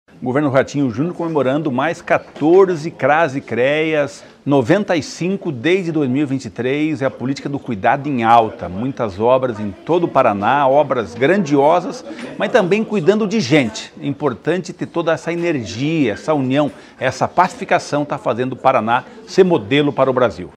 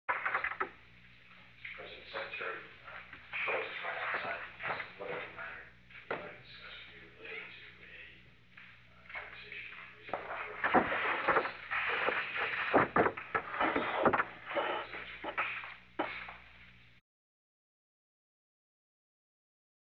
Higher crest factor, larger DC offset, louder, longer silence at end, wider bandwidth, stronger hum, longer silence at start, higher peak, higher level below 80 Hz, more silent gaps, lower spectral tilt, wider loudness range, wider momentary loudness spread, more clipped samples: second, 16 dB vs 26 dB; neither; first, -17 LUFS vs -35 LUFS; second, 0.05 s vs 3.05 s; first, 11 kHz vs 6.6 kHz; second, none vs 60 Hz at -65 dBFS; about the same, 0.2 s vs 0.1 s; first, 0 dBFS vs -12 dBFS; first, -56 dBFS vs -68 dBFS; neither; first, -6 dB/octave vs -2 dB/octave; second, 3 LU vs 16 LU; second, 9 LU vs 20 LU; neither